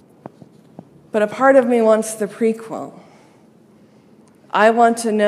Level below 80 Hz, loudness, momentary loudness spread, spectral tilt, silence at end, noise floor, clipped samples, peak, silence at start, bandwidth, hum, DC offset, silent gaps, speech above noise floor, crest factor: -72 dBFS; -16 LUFS; 15 LU; -4.5 dB/octave; 0 s; -49 dBFS; under 0.1%; 0 dBFS; 1.15 s; 14.5 kHz; none; under 0.1%; none; 34 dB; 18 dB